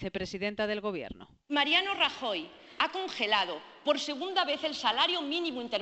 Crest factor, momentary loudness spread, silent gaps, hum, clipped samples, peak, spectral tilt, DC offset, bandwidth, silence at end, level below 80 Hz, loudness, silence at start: 20 dB; 11 LU; none; none; under 0.1%; -10 dBFS; -3 dB/octave; under 0.1%; 8.4 kHz; 0 s; -62 dBFS; -30 LUFS; 0 s